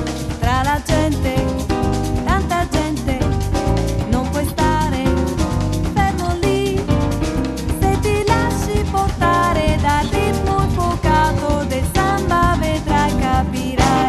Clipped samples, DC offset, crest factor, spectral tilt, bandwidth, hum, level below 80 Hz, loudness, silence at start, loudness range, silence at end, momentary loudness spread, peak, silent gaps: under 0.1%; under 0.1%; 16 dB; -6 dB/octave; 13 kHz; none; -24 dBFS; -18 LUFS; 0 s; 2 LU; 0 s; 4 LU; 0 dBFS; none